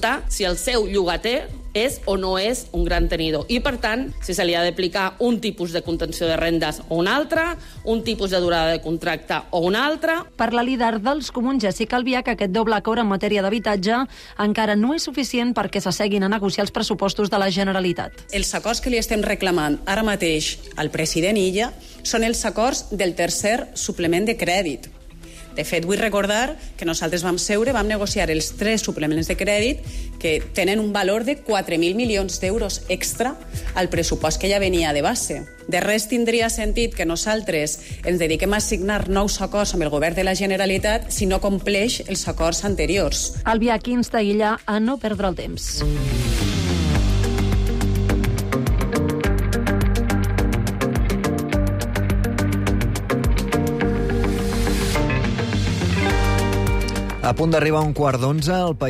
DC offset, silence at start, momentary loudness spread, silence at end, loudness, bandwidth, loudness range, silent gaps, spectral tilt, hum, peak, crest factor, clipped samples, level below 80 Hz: under 0.1%; 0 s; 5 LU; 0 s; -21 LUFS; 15.5 kHz; 1 LU; none; -4.5 dB/octave; none; -8 dBFS; 12 dB; under 0.1%; -30 dBFS